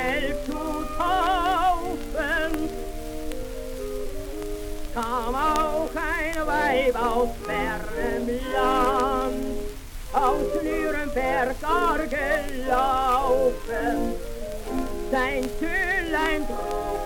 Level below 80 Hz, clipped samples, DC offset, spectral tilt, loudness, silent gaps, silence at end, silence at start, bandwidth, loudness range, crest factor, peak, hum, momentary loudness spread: -34 dBFS; under 0.1%; under 0.1%; -4.5 dB/octave; -25 LUFS; none; 0 s; 0 s; 19 kHz; 5 LU; 16 dB; -10 dBFS; none; 12 LU